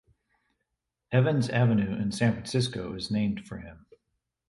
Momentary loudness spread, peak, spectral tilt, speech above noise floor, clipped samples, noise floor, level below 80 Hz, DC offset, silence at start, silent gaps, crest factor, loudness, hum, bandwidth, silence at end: 14 LU; -10 dBFS; -6.5 dB/octave; 56 dB; under 0.1%; -83 dBFS; -56 dBFS; under 0.1%; 1.1 s; none; 18 dB; -27 LUFS; none; 11.5 kHz; 0.7 s